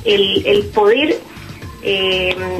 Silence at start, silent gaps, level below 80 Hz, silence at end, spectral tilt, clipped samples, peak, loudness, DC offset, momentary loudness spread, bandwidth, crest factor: 0 s; none; -42 dBFS; 0 s; -5 dB/octave; under 0.1%; -2 dBFS; -15 LUFS; under 0.1%; 19 LU; 13.5 kHz; 14 dB